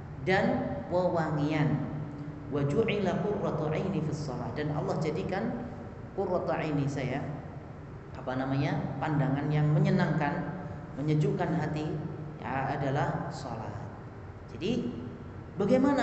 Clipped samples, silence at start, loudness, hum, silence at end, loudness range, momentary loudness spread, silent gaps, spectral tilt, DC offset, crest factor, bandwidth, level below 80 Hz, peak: under 0.1%; 0 s; -31 LUFS; none; 0 s; 5 LU; 14 LU; none; -8 dB/octave; under 0.1%; 18 dB; 8.2 kHz; -54 dBFS; -12 dBFS